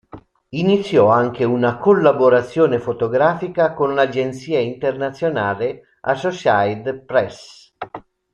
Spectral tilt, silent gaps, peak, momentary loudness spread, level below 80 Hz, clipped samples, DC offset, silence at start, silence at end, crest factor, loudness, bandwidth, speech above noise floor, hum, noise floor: -7 dB/octave; none; -2 dBFS; 13 LU; -56 dBFS; under 0.1%; under 0.1%; 0.15 s; 0.35 s; 16 dB; -18 LUFS; 9.6 kHz; 25 dB; none; -42 dBFS